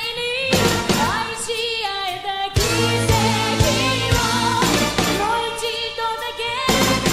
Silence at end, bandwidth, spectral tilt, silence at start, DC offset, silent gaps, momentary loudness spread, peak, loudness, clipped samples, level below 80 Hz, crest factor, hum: 0 s; 16 kHz; -3.5 dB/octave; 0 s; under 0.1%; none; 6 LU; -2 dBFS; -19 LUFS; under 0.1%; -34 dBFS; 18 dB; none